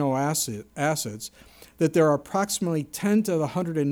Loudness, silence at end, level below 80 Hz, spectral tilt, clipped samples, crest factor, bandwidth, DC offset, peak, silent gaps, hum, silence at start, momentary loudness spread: -25 LUFS; 0 s; -62 dBFS; -5 dB/octave; under 0.1%; 16 dB; over 20 kHz; under 0.1%; -10 dBFS; none; none; 0 s; 8 LU